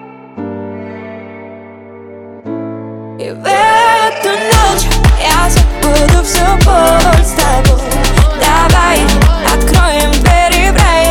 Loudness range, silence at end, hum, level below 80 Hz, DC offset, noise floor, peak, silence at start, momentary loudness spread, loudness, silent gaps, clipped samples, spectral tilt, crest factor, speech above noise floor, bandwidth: 8 LU; 0 s; none; -14 dBFS; under 0.1%; -31 dBFS; 0 dBFS; 0 s; 18 LU; -9 LUFS; none; under 0.1%; -4.5 dB/octave; 10 dB; 23 dB; 19 kHz